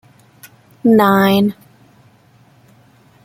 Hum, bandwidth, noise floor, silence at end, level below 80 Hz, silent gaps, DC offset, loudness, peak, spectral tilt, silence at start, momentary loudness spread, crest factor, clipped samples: none; 16 kHz; -50 dBFS; 1.75 s; -58 dBFS; none; under 0.1%; -13 LUFS; 0 dBFS; -6.5 dB/octave; 0.85 s; 8 LU; 18 dB; under 0.1%